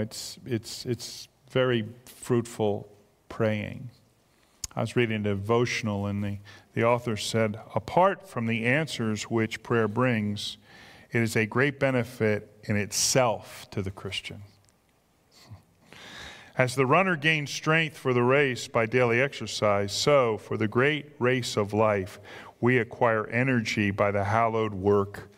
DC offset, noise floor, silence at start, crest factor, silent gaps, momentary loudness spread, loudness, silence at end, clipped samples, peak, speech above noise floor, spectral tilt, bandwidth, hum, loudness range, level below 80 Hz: under 0.1%; -66 dBFS; 0 s; 22 dB; none; 14 LU; -26 LUFS; 0.1 s; under 0.1%; -4 dBFS; 39 dB; -5 dB/octave; 16 kHz; none; 6 LU; -62 dBFS